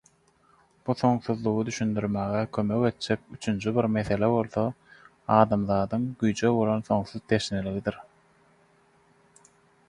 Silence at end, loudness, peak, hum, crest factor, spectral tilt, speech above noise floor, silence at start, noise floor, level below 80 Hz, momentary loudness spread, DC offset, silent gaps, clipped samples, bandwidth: 1.85 s; -27 LUFS; -4 dBFS; none; 24 dB; -6.5 dB/octave; 37 dB; 0.85 s; -63 dBFS; -54 dBFS; 8 LU; under 0.1%; none; under 0.1%; 11 kHz